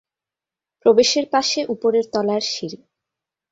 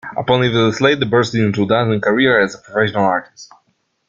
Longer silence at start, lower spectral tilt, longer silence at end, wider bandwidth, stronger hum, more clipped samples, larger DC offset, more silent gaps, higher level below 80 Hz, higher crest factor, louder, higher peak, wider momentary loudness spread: first, 0.85 s vs 0.05 s; second, -3 dB/octave vs -6 dB/octave; about the same, 0.75 s vs 0.65 s; about the same, 8 kHz vs 7.6 kHz; neither; neither; neither; neither; second, -64 dBFS vs -52 dBFS; about the same, 18 dB vs 16 dB; second, -19 LUFS vs -15 LUFS; about the same, -2 dBFS vs -2 dBFS; first, 10 LU vs 5 LU